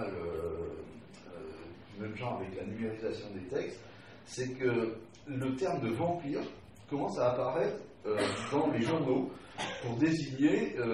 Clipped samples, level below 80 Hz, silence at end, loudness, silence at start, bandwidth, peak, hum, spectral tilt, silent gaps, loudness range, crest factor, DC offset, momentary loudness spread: under 0.1%; -62 dBFS; 0 s; -34 LUFS; 0 s; 12 kHz; -16 dBFS; none; -6 dB/octave; none; 8 LU; 18 dB; under 0.1%; 16 LU